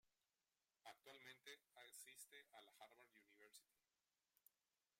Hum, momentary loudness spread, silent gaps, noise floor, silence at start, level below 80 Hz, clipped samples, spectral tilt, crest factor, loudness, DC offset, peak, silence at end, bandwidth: none; 7 LU; none; under -90 dBFS; 0.05 s; under -90 dBFS; under 0.1%; 0 dB/octave; 22 dB; -64 LUFS; under 0.1%; -46 dBFS; 0.5 s; 16 kHz